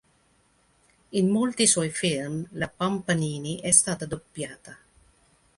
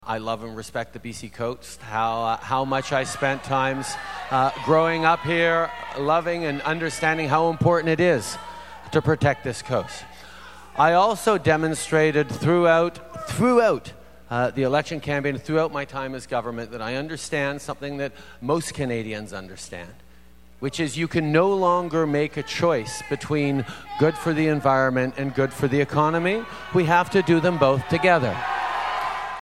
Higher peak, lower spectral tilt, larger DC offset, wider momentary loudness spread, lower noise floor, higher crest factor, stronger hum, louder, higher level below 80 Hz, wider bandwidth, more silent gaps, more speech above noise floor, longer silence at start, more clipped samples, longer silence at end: about the same, -2 dBFS vs -2 dBFS; second, -3.5 dB/octave vs -5.5 dB/octave; second, under 0.1% vs 0.4%; first, 16 LU vs 13 LU; first, -65 dBFS vs -51 dBFS; first, 26 dB vs 20 dB; neither; about the same, -24 LUFS vs -23 LUFS; second, -58 dBFS vs -52 dBFS; second, 11.5 kHz vs 15.5 kHz; neither; first, 39 dB vs 29 dB; first, 1.1 s vs 0.05 s; neither; first, 0.85 s vs 0 s